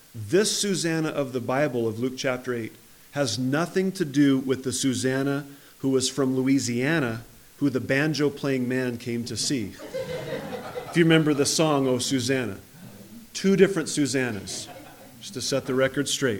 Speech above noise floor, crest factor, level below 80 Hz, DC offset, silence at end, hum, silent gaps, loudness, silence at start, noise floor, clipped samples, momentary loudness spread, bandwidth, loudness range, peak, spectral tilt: 21 dB; 20 dB; -62 dBFS; under 0.1%; 0 s; none; none; -25 LUFS; 0.15 s; -45 dBFS; under 0.1%; 13 LU; 19.5 kHz; 3 LU; -6 dBFS; -4.5 dB/octave